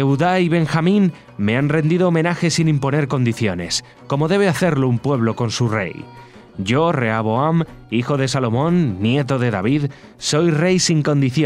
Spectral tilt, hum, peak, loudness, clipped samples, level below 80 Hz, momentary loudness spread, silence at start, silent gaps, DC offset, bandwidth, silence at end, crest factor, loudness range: -6 dB/octave; none; -4 dBFS; -18 LUFS; under 0.1%; -50 dBFS; 7 LU; 0 s; none; under 0.1%; 13 kHz; 0 s; 14 dB; 2 LU